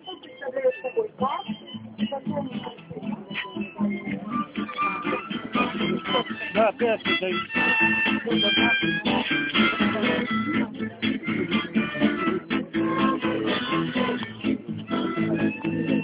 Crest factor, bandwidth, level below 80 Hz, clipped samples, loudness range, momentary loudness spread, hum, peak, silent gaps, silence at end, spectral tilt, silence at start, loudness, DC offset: 16 dB; 4 kHz; -56 dBFS; under 0.1%; 9 LU; 11 LU; none; -10 dBFS; none; 0 s; -3 dB/octave; 0.05 s; -25 LUFS; under 0.1%